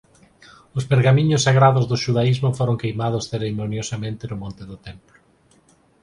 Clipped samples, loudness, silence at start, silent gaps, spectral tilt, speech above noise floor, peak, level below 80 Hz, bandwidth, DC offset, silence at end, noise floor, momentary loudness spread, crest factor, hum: under 0.1%; -20 LUFS; 0.75 s; none; -6 dB/octave; 38 dB; -2 dBFS; -50 dBFS; 11 kHz; under 0.1%; 1.05 s; -57 dBFS; 18 LU; 18 dB; none